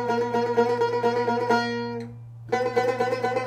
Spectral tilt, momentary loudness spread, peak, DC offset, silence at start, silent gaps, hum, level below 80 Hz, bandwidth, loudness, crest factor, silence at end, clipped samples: -5.5 dB/octave; 10 LU; -8 dBFS; under 0.1%; 0 s; none; none; -66 dBFS; 9.6 kHz; -24 LUFS; 16 dB; 0 s; under 0.1%